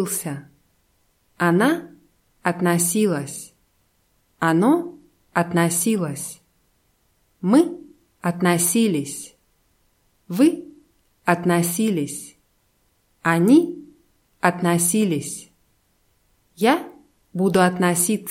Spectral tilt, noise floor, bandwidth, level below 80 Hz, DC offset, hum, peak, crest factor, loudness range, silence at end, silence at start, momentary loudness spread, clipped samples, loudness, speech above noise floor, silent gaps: -5 dB/octave; -65 dBFS; 16.5 kHz; -64 dBFS; under 0.1%; none; 0 dBFS; 22 dB; 2 LU; 0 s; 0 s; 16 LU; under 0.1%; -20 LUFS; 45 dB; none